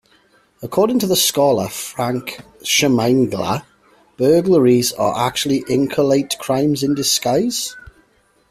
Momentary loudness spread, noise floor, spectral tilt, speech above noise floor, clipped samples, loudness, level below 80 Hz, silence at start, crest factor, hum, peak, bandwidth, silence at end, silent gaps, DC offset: 10 LU; -57 dBFS; -4 dB/octave; 41 dB; under 0.1%; -17 LUFS; -54 dBFS; 0.6 s; 14 dB; none; -2 dBFS; 16 kHz; 0.7 s; none; under 0.1%